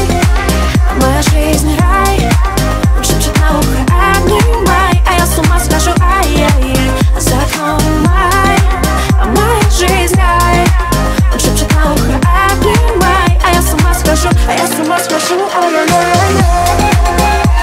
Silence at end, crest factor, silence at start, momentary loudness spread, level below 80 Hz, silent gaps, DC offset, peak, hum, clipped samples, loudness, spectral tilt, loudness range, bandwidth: 0 s; 10 dB; 0 s; 3 LU; -14 dBFS; none; under 0.1%; 0 dBFS; none; under 0.1%; -10 LUFS; -5 dB/octave; 1 LU; 16.5 kHz